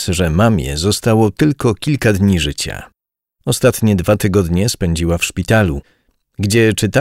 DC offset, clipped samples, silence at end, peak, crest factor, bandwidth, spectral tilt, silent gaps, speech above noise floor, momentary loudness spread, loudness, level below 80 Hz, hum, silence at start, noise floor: under 0.1%; under 0.1%; 0 s; 0 dBFS; 14 dB; 16 kHz; -5.5 dB/octave; none; 53 dB; 7 LU; -15 LUFS; -32 dBFS; none; 0 s; -67 dBFS